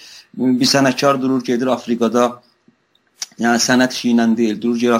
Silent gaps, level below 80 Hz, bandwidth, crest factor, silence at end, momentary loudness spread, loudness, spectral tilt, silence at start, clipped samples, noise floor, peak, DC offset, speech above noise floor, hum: none; -62 dBFS; 15.5 kHz; 16 dB; 0 s; 7 LU; -16 LUFS; -4 dB/octave; 0.05 s; under 0.1%; -59 dBFS; -2 dBFS; under 0.1%; 44 dB; none